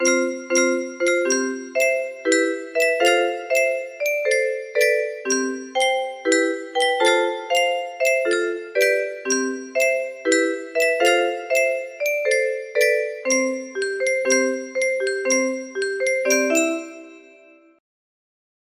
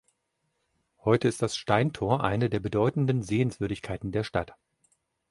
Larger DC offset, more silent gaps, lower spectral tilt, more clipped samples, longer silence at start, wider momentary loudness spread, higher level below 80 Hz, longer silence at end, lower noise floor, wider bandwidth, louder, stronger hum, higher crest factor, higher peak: neither; neither; second, 0 dB/octave vs -6.5 dB/octave; neither; second, 0 s vs 1.05 s; about the same, 6 LU vs 8 LU; second, -72 dBFS vs -52 dBFS; first, 1.55 s vs 0.8 s; second, -50 dBFS vs -78 dBFS; first, 15.5 kHz vs 11.5 kHz; first, -21 LUFS vs -28 LUFS; neither; about the same, 18 dB vs 22 dB; about the same, -4 dBFS vs -6 dBFS